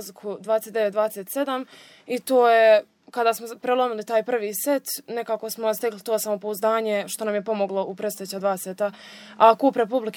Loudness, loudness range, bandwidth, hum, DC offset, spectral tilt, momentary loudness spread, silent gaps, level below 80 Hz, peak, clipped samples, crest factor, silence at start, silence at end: -23 LUFS; 4 LU; over 20 kHz; none; under 0.1%; -3.5 dB/octave; 12 LU; none; -84 dBFS; -2 dBFS; under 0.1%; 22 dB; 0 s; 0 s